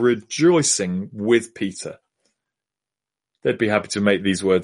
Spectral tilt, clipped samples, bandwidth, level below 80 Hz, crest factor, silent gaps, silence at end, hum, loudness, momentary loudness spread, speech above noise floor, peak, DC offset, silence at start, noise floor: -4 dB/octave; under 0.1%; 11.5 kHz; -62 dBFS; 18 dB; none; 0 s; none; -20 LUFS; 11 LU; 69 dB; -4 dBFS; under 0.1%; 0 s; -89 dBFS